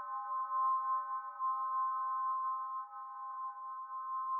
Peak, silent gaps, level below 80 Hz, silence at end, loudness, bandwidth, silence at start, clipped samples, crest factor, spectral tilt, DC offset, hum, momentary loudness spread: -26 dBFS; none; under -90 dBFS; 0 s; -38 LUFS; 2.2 kHz; 0 s; under 0.1%; 12 dB; 14.5 dB/octave; under 0.1%; none; 10 LU